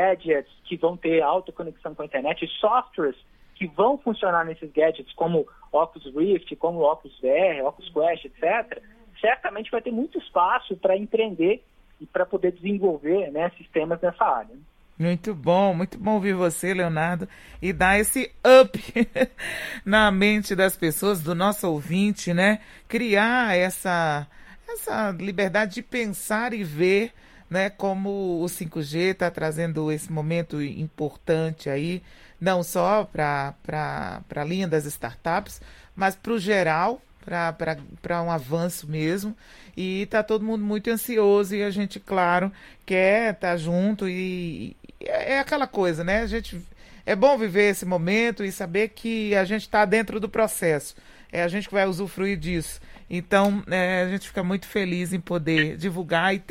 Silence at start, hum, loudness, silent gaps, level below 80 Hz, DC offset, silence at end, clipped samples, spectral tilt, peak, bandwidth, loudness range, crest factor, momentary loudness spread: 0 s; none; -24 LUFS; none; -50 dBFS; under 0.1%; 0.1 s; under 0.1%; -5 dB/octave; -2 dBFS; 16.5 kHz; 6 LU; 22 dB; 10 LU